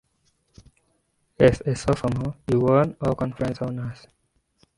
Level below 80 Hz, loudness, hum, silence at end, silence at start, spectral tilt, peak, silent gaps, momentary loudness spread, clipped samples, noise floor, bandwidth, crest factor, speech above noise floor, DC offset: -46 dBFS; -23 LUFS; none; 0.85 s; 1.4 s; -7.5 dB/octave; -2 dBFS; none; 11 LU; under 0.1%; -69 dBFS; 11.5 kHz; 22 dB; 47 dB; under 0.1%